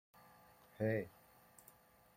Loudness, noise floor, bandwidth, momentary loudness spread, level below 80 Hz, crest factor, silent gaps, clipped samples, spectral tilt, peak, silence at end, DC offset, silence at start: -42 LUFS; -67 dBFS; 16.5 kHz; 25 LU; -78 dBFS; 22 dB; none; under 0.1%; -7.5 dB/octave; -24 dBFS; 1.05 s; under 0.1%; 0.8 s